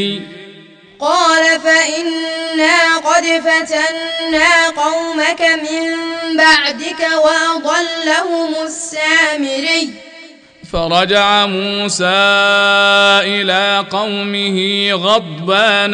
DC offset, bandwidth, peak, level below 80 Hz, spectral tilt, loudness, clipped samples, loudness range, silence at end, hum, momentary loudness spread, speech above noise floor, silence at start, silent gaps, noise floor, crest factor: under 0.1%; 10 kHz; 0 dBFS; -46 dBFS; -2.5 dB/octave; -12 LUFS; under 0.1%; 3 LU; 0 s; none; 9 LU; 26 dB; 0 s; none; -40 dBFS; 14 dB